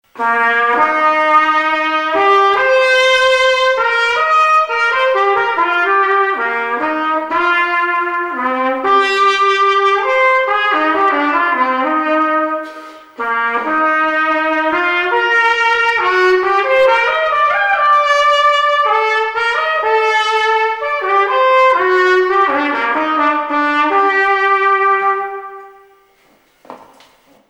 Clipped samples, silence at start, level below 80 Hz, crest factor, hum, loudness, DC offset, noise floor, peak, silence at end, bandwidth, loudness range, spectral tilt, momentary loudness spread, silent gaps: under 0.1%; 0.15 s; -56 dBFS; 12 dB; none; -13 LUFS; under 0.1%; -53 dBFS; 0 dBFS; 0.65 s; 12 kHz; 4 LU; -2 dB/octave; 6 LU; none